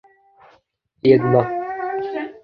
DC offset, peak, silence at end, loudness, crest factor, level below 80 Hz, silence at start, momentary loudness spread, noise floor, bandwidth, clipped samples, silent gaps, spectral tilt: under 0.1%; -2 dBFS; 0.05 s; -19 LUFS; 20 dB; -56 dBFS; 1.05 s; 11 LU; -61 dBFS; 5.2 kHz; under 0.1%; none; -10 dB/octave